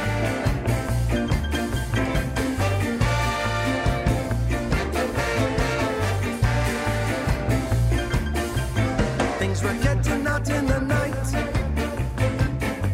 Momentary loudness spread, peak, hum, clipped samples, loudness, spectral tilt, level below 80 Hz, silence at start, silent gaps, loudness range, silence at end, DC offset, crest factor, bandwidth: 3 LU; -8 dBFS; none; under 0.1%; -24 LUFS; -6 dB/octave; -30 dBFS; 0 s; none; 0 LU; 0 s; under 0.1%; 14 dB; 16 kHz